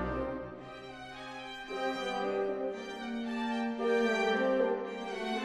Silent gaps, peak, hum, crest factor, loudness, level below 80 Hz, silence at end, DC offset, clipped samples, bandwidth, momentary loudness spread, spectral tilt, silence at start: none; -18 dBFS; none; 16 dB; -34 LUFS; -56 dBFS; 0 s; under 0.1%; under 0.1%; 12.5 kHz; 15 LU; -5 dB/octave; 0 s